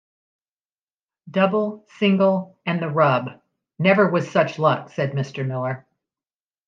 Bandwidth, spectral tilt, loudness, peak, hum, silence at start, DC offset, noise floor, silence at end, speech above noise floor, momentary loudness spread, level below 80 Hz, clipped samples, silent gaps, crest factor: 7.4 kHz; -7.5 dB/octave; -21 LUFS; -2 dBFS; none; 1.25 s; under 0.1%; under -90 dBFS; 0.9 s; over 70 dB; 10 LU; -72 dBFS; under 0.1%; none; 20 dB